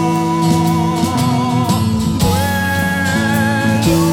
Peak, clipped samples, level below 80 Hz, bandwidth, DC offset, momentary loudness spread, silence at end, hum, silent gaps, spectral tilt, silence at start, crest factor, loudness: 0 dBFS; under 0.1%; -36 dBFS; 18 kHz; under 0.1%; 2 LU; 0 s; none; none; -5.5 dB/octave; 0 s; 14 dB; -15 LUFS